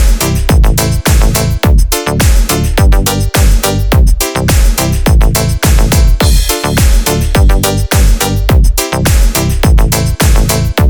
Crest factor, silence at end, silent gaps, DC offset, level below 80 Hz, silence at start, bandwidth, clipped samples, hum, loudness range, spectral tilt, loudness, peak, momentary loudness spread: 8 dB; 0 s; none; under 0.1%; -10 dBFS; 0 s; over 20 kHz; under 0.1%; none; 0 LU; -4.5 dB/octave; -10 LUFS; 0 dBFS; 2 LU